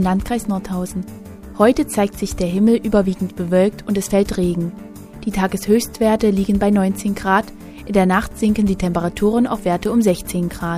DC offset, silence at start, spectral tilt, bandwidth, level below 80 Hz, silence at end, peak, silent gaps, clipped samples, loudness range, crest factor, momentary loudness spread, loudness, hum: under 0.1%; 0 s; -6.5 dB/octave; 15.5 kHz; -36 dBFS; 0 s; 0 dBFS; none; under 0.1%; 1 LU; 16 dB; 10 LU; -18 LUFS; none